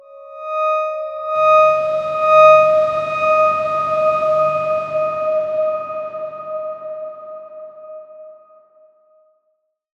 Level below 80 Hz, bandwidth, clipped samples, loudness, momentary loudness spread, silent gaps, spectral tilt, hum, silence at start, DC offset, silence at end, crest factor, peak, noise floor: -60 dBFS; 7.2 kHz; under 0.1%; -16 LUFS; 23 LU; none; -4.5 dB/octave; none; 0.1 s; under 0.1%; 1.65 s; 16 dB; -2 dBFS; -69 dBFS